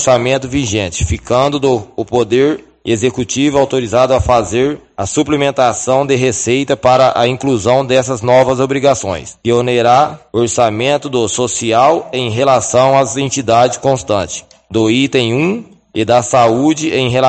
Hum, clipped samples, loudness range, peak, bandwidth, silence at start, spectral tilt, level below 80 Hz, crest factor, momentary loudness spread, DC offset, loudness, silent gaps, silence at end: none; under 0.1%; 2 LU; 0 dBFS; 9.2 kHz; 0 s; -4.5 dB/octave; -36 dBFS; 12 dB; 7 LU; under 0.1%; -13 LUFS; none; 0 s